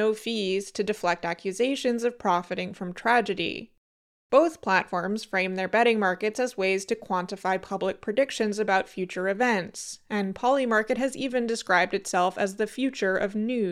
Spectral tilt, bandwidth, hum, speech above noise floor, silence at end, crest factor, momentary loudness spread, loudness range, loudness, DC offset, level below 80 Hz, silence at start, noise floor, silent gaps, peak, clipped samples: -4.5 dB/octave; 14.5 kHz; none; over 64 dB; 0 s; 18 dB; 7 LU; 2 LU; -26 LUFS; under 0.1%; -64 dBFS; 0 s; under -90 dBFS; 3.78-4.30 s; -8 dBFS; under 0.1%